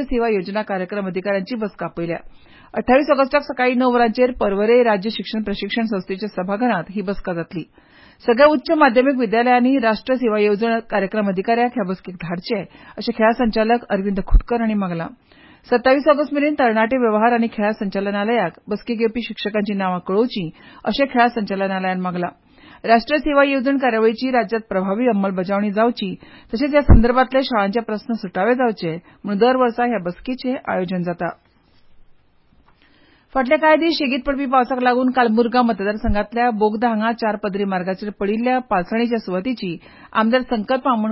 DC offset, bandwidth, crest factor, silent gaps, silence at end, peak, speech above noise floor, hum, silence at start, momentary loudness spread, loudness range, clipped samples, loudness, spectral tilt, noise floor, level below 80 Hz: under 0.1%; 5.8 kHz; 16 dB; none; 0 s; -2 dBFS; 36 dB; none; 0 s; 11 LU; 4 LU; under 0.1%; -19 LUFS; -11 dB/octave; -54 dBFS; -32 dBFS